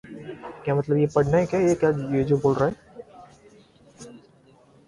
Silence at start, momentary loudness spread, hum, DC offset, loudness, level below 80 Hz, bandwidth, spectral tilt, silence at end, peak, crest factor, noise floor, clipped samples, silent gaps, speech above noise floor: 0.05 s; 24 LU; none; under 0.1%; -23 LUFS; -52 dBFS; 11.5 kHz; -8 dB/octave; 0.7 s; -6 dBFS; 18 dB; -55 dBFS; under 0.1%; none; 34 dB